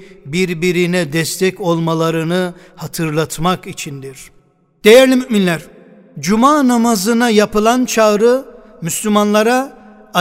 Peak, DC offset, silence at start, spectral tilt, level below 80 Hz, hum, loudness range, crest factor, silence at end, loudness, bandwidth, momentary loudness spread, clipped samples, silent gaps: 0 dBFS; under 0.1%; 0 s; -4.5 dB/octave; -44 dBFS; none; 6 LU; 14 dB; 0 s; -14 LUFS; 16.5 kHz; 13 LU; 0.3%; none